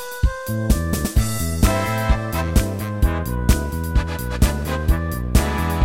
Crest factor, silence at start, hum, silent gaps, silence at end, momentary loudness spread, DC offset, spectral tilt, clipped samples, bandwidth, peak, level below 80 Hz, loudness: 18 dB; 0 s; none; none; 0 s; 4 LU; under 0.1%; -5.5 dB/octave; under 0.1%; 17 kHz; -2 dBFS; -22 dBFS; -21 LUFS